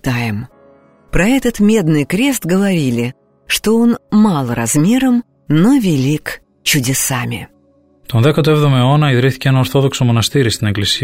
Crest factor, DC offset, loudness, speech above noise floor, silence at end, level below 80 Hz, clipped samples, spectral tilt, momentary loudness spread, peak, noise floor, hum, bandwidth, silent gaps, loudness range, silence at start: 12 dB; under 0.1%; -14 LUFS; 39 dB; 0 s; -36 dBFS; under 0.1%; -5 dB/octave; 8 LU; -2 dBFS; -52 dBFS; none; 16.5 kHz; none; 2 LU; 0.05 s